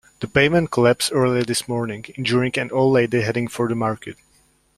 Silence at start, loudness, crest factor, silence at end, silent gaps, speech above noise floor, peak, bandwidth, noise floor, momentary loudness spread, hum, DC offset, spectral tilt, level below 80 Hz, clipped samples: 0.2 s; -20 LUFS; 18 dB; 0.65 s; none; 40 dB; -2 dBFS; 15 kHz; -59 dBFS; 9 LU; none; under 0.1%; -5 dB/octave; -52 dBFS; under 0.1%